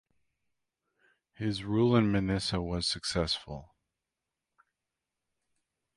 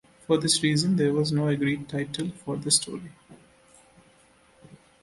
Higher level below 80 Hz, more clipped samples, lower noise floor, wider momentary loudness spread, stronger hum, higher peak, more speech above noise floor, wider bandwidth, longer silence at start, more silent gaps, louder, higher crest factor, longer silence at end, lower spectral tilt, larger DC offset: first, -52 dBFS vs -62 dBFS; neither; first, -88 dBFS vs -59 dBFS; about the same, 11 LU vs 11 LU; neither; second, -12 dBFS vs -8 dBFS; first, 59 dB vs 34 dB; about the same, 11.5 kHz vs 11.5 kHz; first, 1.4 s vs 0.3 s; neither; second, -30 LUFS vs -25 LUFS; about the same, 22 dB vs 20 dB; first, 2.3 s vs 0.3 s; first, -5.5 dB/octave vs -4 dB/octave; neither